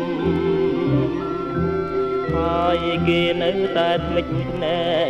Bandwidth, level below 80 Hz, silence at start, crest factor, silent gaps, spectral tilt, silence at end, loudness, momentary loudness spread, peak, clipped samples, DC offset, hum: 8.4 kHz; -40 dBFS; 0 s; 14 dB; none; -7.5 dB/octave; 0 s; -21 LUFS; 4 LU; -8 dBFS; under 0.1%; under 0.1%; none